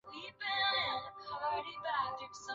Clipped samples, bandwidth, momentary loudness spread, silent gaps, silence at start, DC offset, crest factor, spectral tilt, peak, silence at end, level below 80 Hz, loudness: under 0.1%; 7.6 kHz; 12 LU; none; 0.05 s; under 0.1%; 16 dB; 1.5 dB/octave; -22 dBFS; 0 s; -72 dBFS; -36 LUFS